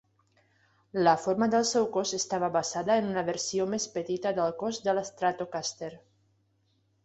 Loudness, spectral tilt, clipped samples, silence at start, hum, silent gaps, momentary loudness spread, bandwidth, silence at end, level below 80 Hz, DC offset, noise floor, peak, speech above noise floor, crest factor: -29 LUFS; -3.5 dB/octave; under 0.1%; 0.95 s; none; none; 8 LU; 8.2 kHz; 1.1 s; -70 dBFS; under 0.1%; -71 dBFS; -10 dBFS; 43 dB; 20 dB